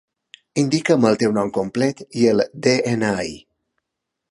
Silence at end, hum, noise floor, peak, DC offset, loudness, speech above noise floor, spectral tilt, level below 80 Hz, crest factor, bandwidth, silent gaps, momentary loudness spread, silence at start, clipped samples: 0.9 s; none; -81 dBFS; -2 dBFS; under 0.1%; -19 LUFS; 62 dB; -5.5 dB/octave; -56 dBFS; 18 dB; 11.5 kHz; none; 6 LU; 0.55 s; under 0.1%